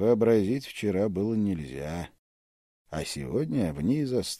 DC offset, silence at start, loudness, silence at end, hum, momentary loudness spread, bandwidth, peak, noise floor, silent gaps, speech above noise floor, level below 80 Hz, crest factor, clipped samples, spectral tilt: under 0.1%; 0 s; -28 LUFS; 0 s; none; 13 LU; 15 kHz; -10 dBFS; under -90 dBFS; 2.19-2.85 s; over 63 dB; -52 dBFS; 16 dB; under 0.1%; -6.5 dB/octave